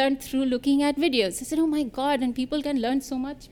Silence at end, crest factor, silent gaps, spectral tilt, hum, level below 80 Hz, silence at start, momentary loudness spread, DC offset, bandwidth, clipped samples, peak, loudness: 0.05 s; 18 dB; none; -3.5 dB/octave; none; -52 dBFS; 0 s; 5 LU; under 0.1%; 17.5 kHz; under 0.1%; -8 dBFS; -25 LUFS